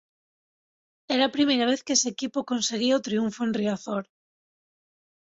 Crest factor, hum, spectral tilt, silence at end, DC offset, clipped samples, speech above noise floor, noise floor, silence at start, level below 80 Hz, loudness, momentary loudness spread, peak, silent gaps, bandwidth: 18 dB; none; -3 dB/octave; 1.35 s; under 0.1%; under 0.1%; over 65 dB; under -90 dBFS; 1.1 s; -70 dBFS; -25 LUFS; 8 LU; -8 dBFS; none; 8 kHz